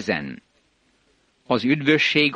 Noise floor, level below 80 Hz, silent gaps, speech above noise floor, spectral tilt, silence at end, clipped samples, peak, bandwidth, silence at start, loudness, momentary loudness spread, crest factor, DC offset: -64 dBFS; -60 dBFS; none; 43 dB; -5 dB/octave; 0 s; under 0.1%; -4 dBFS; 9.2 kHz; 0 s; -20 LUFS; 19 LU; 20 dB; under 0.1%